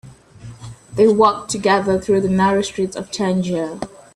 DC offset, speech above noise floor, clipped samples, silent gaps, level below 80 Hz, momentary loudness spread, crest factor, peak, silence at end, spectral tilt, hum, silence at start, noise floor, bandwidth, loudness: under 0.1%; 22 dB; under 0.1%; none; -48 dBFS; 16 LU; 16 dB; -2 dBFS; 0.3 s; -5.5 dB/octave; none; 0.05 s; -39 dBFS; 12 kHz; -17 LUFS